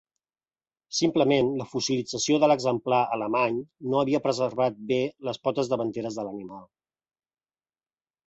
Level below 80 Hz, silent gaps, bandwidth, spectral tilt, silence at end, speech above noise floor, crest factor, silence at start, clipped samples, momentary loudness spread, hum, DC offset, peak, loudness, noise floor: -66 dBFS; none; 8.2 kHz; -4.5 dB/octave; 1.65 s; over 64 dB; 18 dB; 0.9 s; under 0.1%; 10 LU; none; under 0.1%; -10 dBFS; -26 LUFS; under -90 dBFS